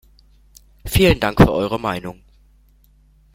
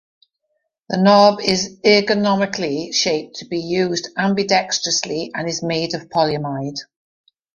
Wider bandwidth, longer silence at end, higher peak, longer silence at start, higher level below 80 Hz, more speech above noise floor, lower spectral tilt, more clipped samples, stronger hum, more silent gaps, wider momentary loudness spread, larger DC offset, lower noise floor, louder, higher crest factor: first, 16.5 kHz vs 10.5 kHz; first, 1.25 s vs 0.7 s; about the same, 0 dBFS vs -2 dBFS; about the same, 0.85 s vs 0.9 s; first, -32 dBFS vs -58 dBFS; second, 37 dB vs 55 dB; first, -6 dB/octave vs -4 dB/octave; neither; neither; neither; first, 18 LU vs 11 LU; neither; second, -53 dBFS vs -73 dBFS; about the same, -17 LUFS vs -18 LUFS; about the same, 20 dB vs 18 dB